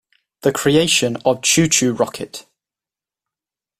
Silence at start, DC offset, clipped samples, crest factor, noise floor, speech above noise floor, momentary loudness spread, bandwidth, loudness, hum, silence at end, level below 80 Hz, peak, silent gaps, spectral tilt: 0.45 s; under 0.1%; under 0.1%; 18 dB; -90 dBFS; 73 dB; 15 LU; 16 kHz; -16 LUFS; none; 1.4 s; -52 dBFS; -2 dBFS; none; -3 dB/octave